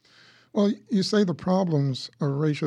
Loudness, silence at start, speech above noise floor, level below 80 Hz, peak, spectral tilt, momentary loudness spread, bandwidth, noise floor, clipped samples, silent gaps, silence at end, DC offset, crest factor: -25 LUFS; 0.55 s; 32 dB; -66 dBFS; -10 dBFS; -7 dB/octave; 6 LU; 10.5 kHz; -56 dBFS; under 0.1%; none; 0 s; under 0.1%; 14 dB